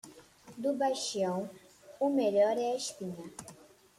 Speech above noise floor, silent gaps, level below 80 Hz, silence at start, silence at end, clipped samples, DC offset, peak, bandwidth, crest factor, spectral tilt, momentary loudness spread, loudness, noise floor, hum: 24 dB; none; -76 dBFS; 0.05 s; 0.45 s; under 0.1%; under 0.1%; -16 dBFS; 15.5 kHz; 16 dB; -4.5 dB/octave; 19 LU; -32 LUFS; -55 dBFS; none